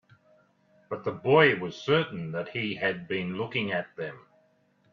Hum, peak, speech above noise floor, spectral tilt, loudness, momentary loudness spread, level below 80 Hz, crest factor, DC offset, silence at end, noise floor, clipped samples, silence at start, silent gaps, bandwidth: none; -6 dBFS; 39 dB; -6.5 dB/octave; -27 LUFS; 16 LU; -68 dBFS; 24 dB; under 0.1%; 0.75 s; -66 dBFS; under 0.1%; 0.9 s; none; 7.2 kHz